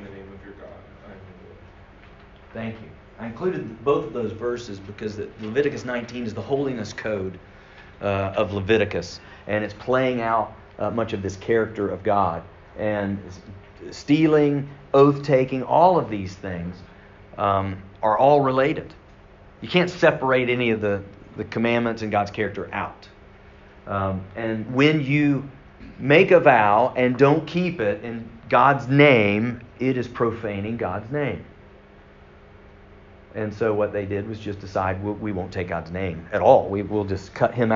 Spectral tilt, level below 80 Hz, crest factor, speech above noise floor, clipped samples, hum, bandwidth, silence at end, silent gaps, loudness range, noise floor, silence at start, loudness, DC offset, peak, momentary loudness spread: -5 dB/octave; -52 dBFS; 22 dB; 26 dB; under 0.1%; none; 7.4 kHz; 0 s; none; 10 LU; -48 dBFS; 0 s; -22 LUFS; under 0.1%; -2 dBFS; 17 LU